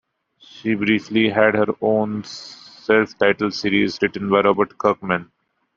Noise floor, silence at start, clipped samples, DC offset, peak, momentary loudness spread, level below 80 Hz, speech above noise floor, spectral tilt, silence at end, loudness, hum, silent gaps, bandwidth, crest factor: -51 dBFS; 0.55 s; under 0.1%; under 0.1%; -2 dBFS; 12 LU; -60 dBFS; 33 dB; -6 dB/octave; 0.55 s; -19 LUFS; none; none; 7.4 kHz; 18 dB